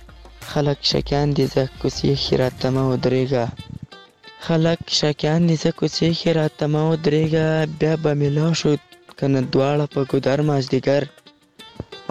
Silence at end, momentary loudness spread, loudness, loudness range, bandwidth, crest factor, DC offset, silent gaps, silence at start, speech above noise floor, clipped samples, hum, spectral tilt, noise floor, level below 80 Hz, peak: 0.05 s; 7 LU; -20 LUFS; 2 LU; 12 kHz; 16 dB; 0.2%; none; 0 s; 27 dB; under 0.1%; none; -6 dB/octave; -46 dBFS; -44 dBFS; -4 dBFS